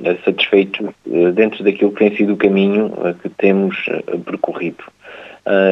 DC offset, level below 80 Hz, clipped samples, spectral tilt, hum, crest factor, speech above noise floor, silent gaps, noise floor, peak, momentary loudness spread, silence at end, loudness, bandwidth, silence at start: under 0.1%; -62 dBFS; under 0.1%; -8 dB/octave; none; 16 dB; 22 dB; none; -37 dBFS; 0 dBFS; 11 LU; 0 s; -16 LUFS; 5.8 kHz; 0 s